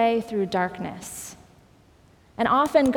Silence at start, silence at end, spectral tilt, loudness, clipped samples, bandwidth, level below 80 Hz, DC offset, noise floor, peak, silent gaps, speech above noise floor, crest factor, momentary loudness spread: 0 s; 0 s; -5 dB/octave; -24 LUFS; under 0.1%; over 20 kHz; -56 dBFS; under 0.1%; -55 dBFS; -6 dBFS; none; 33 dB; 18 dB; 18 LU